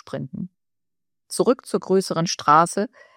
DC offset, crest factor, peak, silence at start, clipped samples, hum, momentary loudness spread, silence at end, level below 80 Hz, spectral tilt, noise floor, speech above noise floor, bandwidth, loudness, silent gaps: under 0.1%; 20 dB; -2 dBFS; 0.05 s; under 0.1%; none; 17 LU; 0.3 s; -68 dBFS; -4.5 dB/octave; -90 dBFS; 69 dB; 16 kHz; -20 LUFS; none